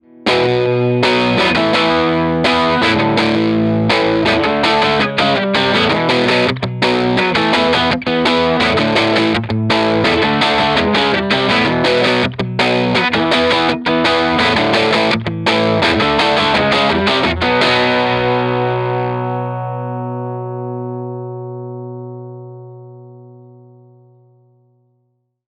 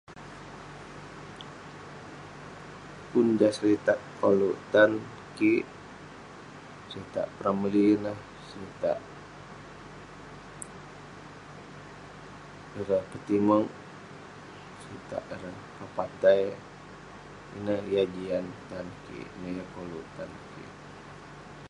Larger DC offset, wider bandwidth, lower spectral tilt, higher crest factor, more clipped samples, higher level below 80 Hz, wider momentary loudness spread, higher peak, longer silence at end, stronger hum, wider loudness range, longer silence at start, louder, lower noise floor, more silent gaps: neither; about the same, 11 kHz vs 11.5 kHz; about the same, -5.5 dB/octave vs -6.5 dB/octave; second, 14 dB vs 24 dB; neither; first, -42 dBFS vs -60 dBFS; second, 11 LU vs 22 LU; first, 0 dBFS vs -8 dBFS; first, 2.15 s vs 0 s; first, 60 Hz at -50 dBFS vs 50 Hz at -65 dBFS; about the same, 12 LU vs 13 LU; about the same, 0.2 s vs 0.1 s; first, -14 LUFS vs -28 LUFS; first, -65 dBFS vs -46 dBFS; neither